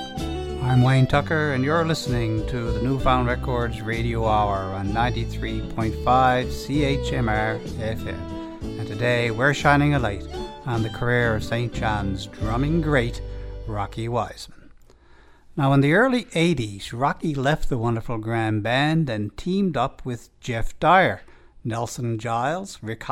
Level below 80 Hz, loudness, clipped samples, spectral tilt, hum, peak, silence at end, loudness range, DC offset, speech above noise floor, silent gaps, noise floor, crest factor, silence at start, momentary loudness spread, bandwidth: -36 dBFS; -23 LUFS; under 0.1%; -6.5 dB/octave; none; -4 dBFS; 0 s; 3 LU; under 0.1%; 28 dB; none; -50 dBFS; 20 dB; 0 s; 14 LU; 14.5 kHz